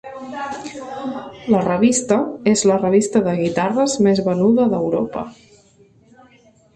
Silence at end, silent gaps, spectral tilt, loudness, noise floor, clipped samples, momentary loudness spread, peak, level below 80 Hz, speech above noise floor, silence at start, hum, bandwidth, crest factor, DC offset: 1.45 s; none; -5.5 dB/octave; -18 LUFS; -52 dBFS; under 0.1%; 14 LU; -4 dBFS; -54 dBFS; 35 dB; 0.05 s; none; 11.5 kHz; 16 dB; under 0.1%